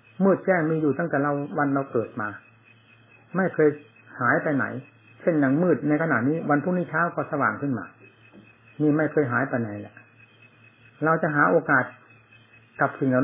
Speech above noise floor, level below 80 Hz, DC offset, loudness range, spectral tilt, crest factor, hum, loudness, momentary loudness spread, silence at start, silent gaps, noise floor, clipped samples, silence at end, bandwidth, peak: 32 dB; -70 dBFS; under 0.1%; 3 LU; -12 dB/octave; 18 dB; none; -24 LUFS; 12 LU; 0.2 s; none; -55 dBFS; under 0.1%; 0 s; 3.7 kHz; -6 dBFS